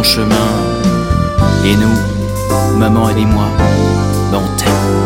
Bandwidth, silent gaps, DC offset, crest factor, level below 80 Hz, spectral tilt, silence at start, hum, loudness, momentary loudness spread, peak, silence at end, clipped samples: 16.5 kHz; none; under 0.1%; 12 dB; -24 dBFS; -5.5 dB/octave; 0 s; none; -12 LUFS; 4 LU; 0 dBFS; 0 s; under 0.1%